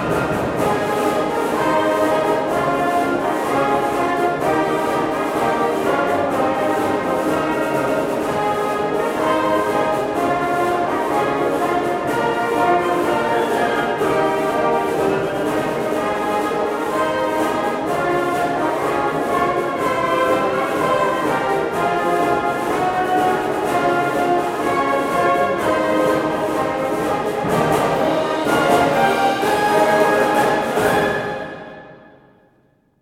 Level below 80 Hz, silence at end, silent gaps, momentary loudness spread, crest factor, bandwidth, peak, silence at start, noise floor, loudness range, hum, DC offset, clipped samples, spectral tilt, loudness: -48 dBFS; 1.05 s; none; 4 LU; 16 dB; 16.5 kHz; -2 dBFS; 0 s; -58 dBFS; 3 LU; none; under 0.1%; under 0.1%; -5 dB/octave; -18 LUFS